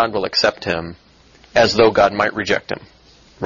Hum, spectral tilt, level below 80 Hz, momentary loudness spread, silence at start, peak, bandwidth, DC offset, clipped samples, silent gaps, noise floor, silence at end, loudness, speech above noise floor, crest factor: none; -4 dB/octave; -48 dBFS; 15 LU; 0 s; 0 dBFS; 7.4 kHz; under 0.1%; under 0.1%; none; -49 dBFS; 0 s; -17 LUFS; 32 dB; 18 dB